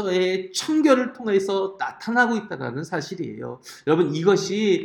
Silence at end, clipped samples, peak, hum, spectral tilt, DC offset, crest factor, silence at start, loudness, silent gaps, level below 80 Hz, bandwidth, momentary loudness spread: 0 s; under 0.1%; -4 dBFS; none; -5 dB/octave; under 0.1%; 18 dB; 0 s; -23 LUFS; none; -68 dBFS; 17 kHz; 12 LU